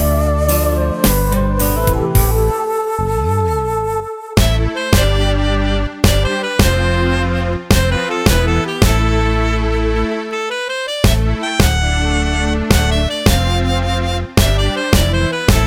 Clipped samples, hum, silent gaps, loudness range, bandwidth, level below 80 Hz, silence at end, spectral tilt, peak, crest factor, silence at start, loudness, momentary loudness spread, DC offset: under 0.1%; none; none; 1 LU; 17 kHz; -20 dBFS; 0 s; -5 dB/octave; 0 dBFS; 14 dB; 0 s; -15 LUFS; 5 LU; under 0.1%